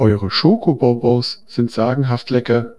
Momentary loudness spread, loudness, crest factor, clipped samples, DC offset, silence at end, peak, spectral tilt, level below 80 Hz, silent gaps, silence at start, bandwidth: 6 LU; -17 LUFS; 16 dB; under 0.1%; 0.7%; 0.05 s; 0 dBFS; -8 dB/octave; -48 dBFS; none; 0 s; 11 kHz